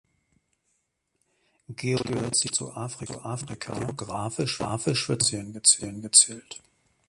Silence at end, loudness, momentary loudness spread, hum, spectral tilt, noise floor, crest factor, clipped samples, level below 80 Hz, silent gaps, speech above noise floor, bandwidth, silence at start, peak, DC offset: 0.5 s; -24 LUFS; 17 LU; none; -2.5 dB/octave; -76 dBFS; 28 dB; under 0.1%; -60 dBFS; none; 49 dB; 11.5 kHz; 1.7 s; -2 dBFS; under 0.1%